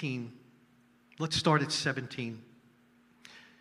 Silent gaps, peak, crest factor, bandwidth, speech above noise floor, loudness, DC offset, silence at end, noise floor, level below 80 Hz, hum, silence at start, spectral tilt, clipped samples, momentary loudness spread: none; -12 dBFS; 24 dB; 13.5 kHz; 33 dB; -31 LUFS; under 0.1%; 0.2 s; -64 dBFS; -66 dBFS; none; 0 s; -4.5 dB/octave; under 0.1%; 26 LU